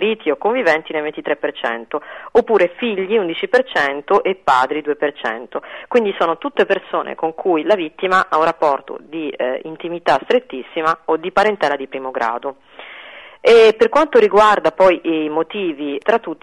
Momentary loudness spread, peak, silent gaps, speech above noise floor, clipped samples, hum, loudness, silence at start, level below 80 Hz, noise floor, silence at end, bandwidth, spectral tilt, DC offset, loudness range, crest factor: 14 LU; -4 dBFS; none; 21 dB; under 0.1%; none; -17 LUFS; 0 s; -54 dBFS; -38 dBFS; 0.1 s; 11 kHz; -4.5 dB/octave; 0.1%; 5 LU; 14 dB